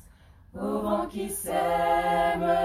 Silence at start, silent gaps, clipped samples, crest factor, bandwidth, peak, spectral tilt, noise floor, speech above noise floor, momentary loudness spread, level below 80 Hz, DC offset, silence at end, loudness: 0.55 s; none; under 0.1%; 14 dB; 16 kHz; -14 dBFS; -4.5 dB/octave; -53 dBFS; 27 dB; 8 LU; -50 dBFS; under 0.1%; 0 s; -27 LUFS